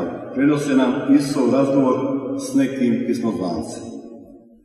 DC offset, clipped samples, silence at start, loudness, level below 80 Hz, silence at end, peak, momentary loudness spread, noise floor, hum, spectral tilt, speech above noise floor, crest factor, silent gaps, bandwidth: under 0.1%; under 0.1%; 0 s; -19 LUFS; -58 dBFS; 0.25 s; -4 dBFS; 14 LU; -43 dBFS; none; -6.5 dB/octave; 25 dB; 16 dB; none; 12.5 kHz